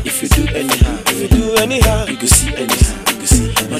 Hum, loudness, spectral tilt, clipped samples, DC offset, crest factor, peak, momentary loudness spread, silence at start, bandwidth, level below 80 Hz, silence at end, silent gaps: none; -13 LUFS; -3.5 dB/octave; under 0.1%; under 0.1%; 14 dB; 0 dBFS; 5 LU; 0 s; 16 kHz; -18 dBFS; 0 s; none